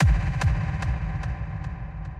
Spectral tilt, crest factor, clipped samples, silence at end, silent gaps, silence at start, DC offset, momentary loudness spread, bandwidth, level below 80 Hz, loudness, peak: -7 dB/octave; 14 dB; under 0.1%; 0 s; none; 0 s; under 0.1%; 10 LU; 10 kHz; -28 dBFS; -28 LUFS; -10 dBFS